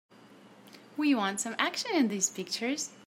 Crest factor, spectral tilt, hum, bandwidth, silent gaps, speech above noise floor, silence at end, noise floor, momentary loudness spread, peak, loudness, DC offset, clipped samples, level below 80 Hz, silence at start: 22 dB; -2.5 dB/octave; none; 16 kHz; none; 25 dB; 0.1 s; -55 dBFS; 6 LU; -10 dBFS; -30 LUFS; under 0.1%; under 0.1%; -88 dBFS; 0.3 s